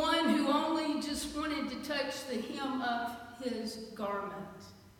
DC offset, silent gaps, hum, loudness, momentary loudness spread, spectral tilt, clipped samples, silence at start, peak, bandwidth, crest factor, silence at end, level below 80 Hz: under 0.1%; none; none; -35 LUFS; 12 LU; -3.5 dB/octave; under 0.1%; 0 s; -18 dBFS; 17 kHz; 18 dB; 0.1 s; -62 dBFS